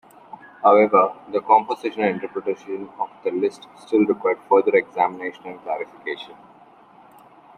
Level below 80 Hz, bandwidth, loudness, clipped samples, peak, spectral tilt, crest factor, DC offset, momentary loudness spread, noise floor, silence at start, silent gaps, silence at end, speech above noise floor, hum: -72 dBFS; 10.5 kHz; -21 LUFS; under 0.1%; -2 dBFS; -6.5 dB/octave; 20 dB; under 0.1%; 15 LU; -50 dBFS; 0.6 s; none; 1.25 s; 29 dB; none